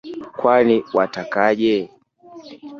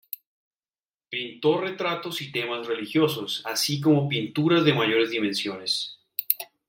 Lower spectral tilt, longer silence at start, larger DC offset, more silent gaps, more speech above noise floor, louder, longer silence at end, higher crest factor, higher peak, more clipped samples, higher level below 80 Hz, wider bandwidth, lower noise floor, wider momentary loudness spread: first, -6.5 dB/octave vs -4.5 dB/octave; second, 0.05 s vs 1.1 s; neither; neither; second, 26 dB vs over 65 dB; first, -18 LUFS vs -25 LUFS; second, 0 s vs 0.25 s; second, 16 dB vs 26 dB; about the same, -2 dBFS vs 0 dBFS; neither; first, -62 dBFS vs -70 dBFS; second, 7 kHz vs 16.5 kHz; second, -43 dBFS vs under -90 dBFS; first, 17 LU vs 11 LU